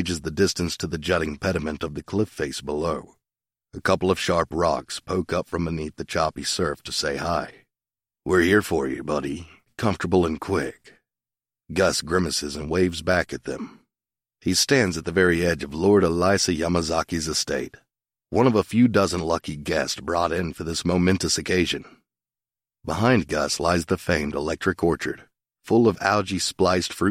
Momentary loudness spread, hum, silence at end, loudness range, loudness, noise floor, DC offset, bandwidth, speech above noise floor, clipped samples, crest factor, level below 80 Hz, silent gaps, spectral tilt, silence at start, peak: 10 LU; none; 0 s; 4 LU; -23 LUFS; under -90 dBFS; under 0.1%; 16 kHz; over 67 dB; under 0.1%; 20 dB; -46 dBFS; none; -4.5 dB/octave; 0 s; -4 dBFS